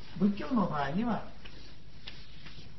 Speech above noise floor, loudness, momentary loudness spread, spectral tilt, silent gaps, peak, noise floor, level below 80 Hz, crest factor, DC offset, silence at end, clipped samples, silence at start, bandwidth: 21 dB; -32 LUFS; 20 LU; -8 dB/octave; none; -16 dBFS; -52 dBFS; -54 dBFS; 18 dB; 1%; 0.05 s; under 0.1%; 0 s; 6 kHz